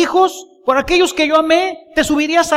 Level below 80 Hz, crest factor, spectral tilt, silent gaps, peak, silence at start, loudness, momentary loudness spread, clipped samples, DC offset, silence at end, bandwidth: -40 dBFS; 14 dB; -2.5 dB/octave; none; 0 dBFS; 0 s; -14 LUFS; 6 LU; under 0.1%; under 0.1%; 0 s; 16 kHz